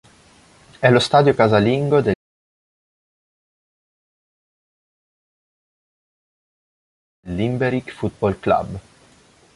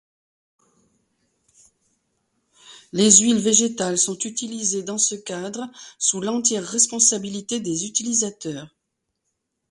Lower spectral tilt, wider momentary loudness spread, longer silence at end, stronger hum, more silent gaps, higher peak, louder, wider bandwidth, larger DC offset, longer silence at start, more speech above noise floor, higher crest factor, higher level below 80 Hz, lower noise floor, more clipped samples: first, -6.5 dB/octave vs -2.5 dB/octave; second, 14 LU vs 17 LU; second, 0.75 s vs 1.05 s; neither; first, 2.15-7.23 s vs none; about the same, -2 dBFS vs 0 dBFS; about the same, -18 LUFS vs -19 LUFS; about the same, 11.5 kHz vs 11.5 kHz; neither; second, 0.8 s vs 2.65 s; second, 36 dB vs 56 dB; about the same, 20 dB vs 24 dB; first, -50 dBFS vs -66 dBFS; second, -53 dBFS vs -78 dBFS; neither